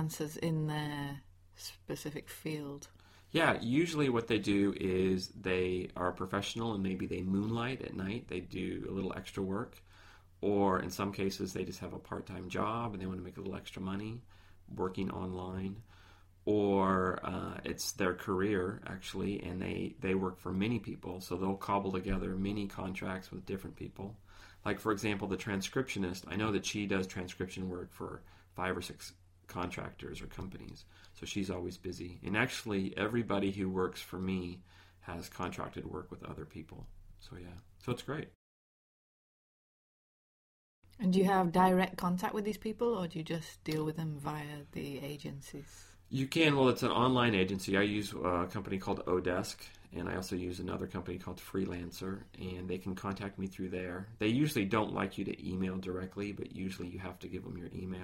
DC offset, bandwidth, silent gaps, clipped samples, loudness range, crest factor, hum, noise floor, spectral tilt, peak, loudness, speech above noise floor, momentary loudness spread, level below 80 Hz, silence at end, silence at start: under 0.1%; 16 kHz; 38.35-40.82 s; under 0.1%; 10 LU; 24 dB; none; -59 dBFS; -5.5 dB/octave; -14 dBFS; -36 LUFS; 24 dB; 15 LU; -58 dBFS; 0 s; 0 s